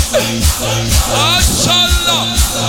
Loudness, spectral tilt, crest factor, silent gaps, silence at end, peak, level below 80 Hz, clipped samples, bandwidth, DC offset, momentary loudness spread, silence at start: -11 LUFS; -2.5 dB/octave; 12 dB; none; 0 s; 0 dBFS; -20 dBFS; under 0.1%; 18 kHz; under 0.1%; 4 LU; 0 s